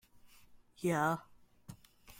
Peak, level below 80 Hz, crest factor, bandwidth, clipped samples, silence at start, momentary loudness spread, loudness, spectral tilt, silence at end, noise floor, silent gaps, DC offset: -20 dBFS; -68 dBFS; 20 dB; 16.5 kHz; under 0.1%; 0.25 s; 24 LU; -35 LUFS; -6 dB/octave; 0.05 s; -61 dBFS; none; under 0.1%